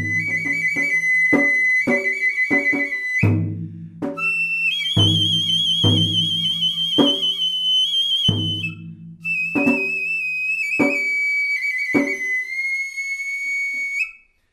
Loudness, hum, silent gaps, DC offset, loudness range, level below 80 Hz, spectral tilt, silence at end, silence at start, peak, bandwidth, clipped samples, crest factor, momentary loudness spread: -18 LUFS; none; none; under 0.1%; 3 LU; -56 dBFS; -4 dB/octave; 0.35 s; 0 s; -4 dBFS; 15 kHz; under 0.1%; 18 dB; 8 LU